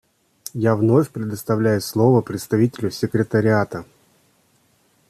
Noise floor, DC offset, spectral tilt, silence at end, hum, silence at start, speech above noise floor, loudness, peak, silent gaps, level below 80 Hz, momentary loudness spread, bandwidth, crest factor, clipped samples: -61 dBFS; under 0.1%; -7 dB/octave; 1.25 s; none; 0.55 s; 42 dB; -20 LUFS; -4 dBFS; none; -58 dBFS; 11 LU; 14.5 kHz; 18 dB; under 0.1%